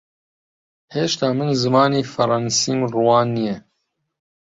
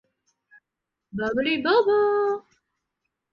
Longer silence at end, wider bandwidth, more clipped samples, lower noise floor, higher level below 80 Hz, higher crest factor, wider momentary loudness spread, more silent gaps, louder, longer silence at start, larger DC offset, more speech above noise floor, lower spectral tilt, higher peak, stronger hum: second, 0.8 s vs 0.95 s; first, 8 kHz vs 6.6 kHz; neither; second, -73 dBFS vs -85 dBFS; about the same, -60 dBFS vs -62 dBFS; about the same, 18 dB vs 18 dB; second, 8 LU vs 12 LU; neither; first, -19 LUFS vs -23 LUFS; second, 0.9 s vs 1.15 s; neither; second, 55 dB vs 63 dB; second, -4.5 dB/octave vs -6 dB/octave; first, -2 dBFS vs -8 dBFS; neither